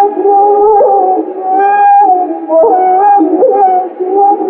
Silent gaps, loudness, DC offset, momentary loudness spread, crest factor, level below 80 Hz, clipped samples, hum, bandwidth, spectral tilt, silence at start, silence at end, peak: none; -8 LUFS; under 0.1%; 6 LU; 8 dB; -56 dBFS; under 0.1%; none; 3.4 kHz; -9 dB/octave; 0 s; 0 s; 0 dBFS